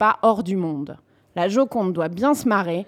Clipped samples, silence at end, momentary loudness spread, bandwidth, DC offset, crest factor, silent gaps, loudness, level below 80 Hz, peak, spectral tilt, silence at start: under 0.1%; 0.05 s; 11 LU; 16.5 kHz; under 0.1%; 16 dB; none; -21 LUFS; -64 dBFS; -4 dBFS; -6 dB/octave; 0 s